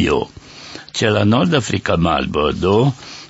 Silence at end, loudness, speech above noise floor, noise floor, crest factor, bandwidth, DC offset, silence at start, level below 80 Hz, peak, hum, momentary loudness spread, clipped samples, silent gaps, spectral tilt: 0 s; -17 LUFS; 20 dB; -36 dBFS; 16 dB; 8 kHz; under 0.1%; 0 s; -38 dBFS; 0 dBFS; none; 16 LU; under 0.1%; none; -6 dB/octave